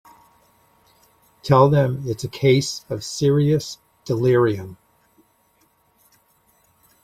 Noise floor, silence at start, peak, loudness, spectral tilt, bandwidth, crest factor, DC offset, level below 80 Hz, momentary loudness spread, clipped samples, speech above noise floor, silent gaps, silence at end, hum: -62 dBFS; 1.45 s; -2 dBFS; -19 LUFS; -6.5 dB/octave; 14.5 kHz; 20 dB; under 0.1%; -56 dBFS; 17 LU; under 0.1%; 43 dB; none; 2.3 s; none